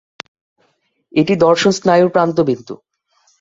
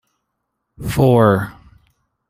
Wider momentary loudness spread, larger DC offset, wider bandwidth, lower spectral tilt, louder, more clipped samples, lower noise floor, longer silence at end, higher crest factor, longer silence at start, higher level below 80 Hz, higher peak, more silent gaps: first, 23 LU vs 18 LU; neither; second, 7.8 kHz vs 16 kHz; second, -5.5 dB/octave vs -7.5 dB/octave; about the same, -14 LUFS vs -15 LUFS; neither; second, -63 dBFS vs -75 dBFS; second, 0.65 s vs 0.8 s; about the same, 16 dB vs 16 dB; first, 1.15 s vs 0.8 s; second, -56 dBFS vs -42 dBFS; about the same, 0 dBFS vs -2 dBFS; neither